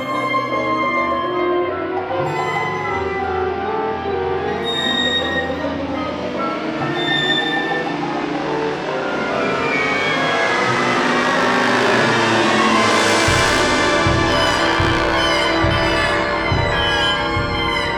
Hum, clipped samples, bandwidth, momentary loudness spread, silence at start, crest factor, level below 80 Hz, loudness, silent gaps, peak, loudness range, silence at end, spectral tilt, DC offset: none; under 0.1%; 17 kHz; 8 LU; 0 s; 16 dB; -36 dBFS; -17 LUFS; none; -2 dBFS; 5 LU; 0 s; -4 dB/octave; under 0.1%